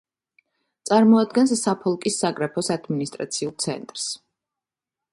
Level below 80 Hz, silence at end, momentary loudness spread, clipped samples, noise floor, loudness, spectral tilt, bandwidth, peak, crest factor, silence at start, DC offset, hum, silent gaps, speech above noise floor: -68 dBFS; 0.95 s; 12 LU; under 0.1%; -88 dBFS; -22 LUFS; -4.5 dB/octave; 11.5 kHz; -4 dBFS; 18 dB; 0.85 s; under 0.1%; none; none; 67 dB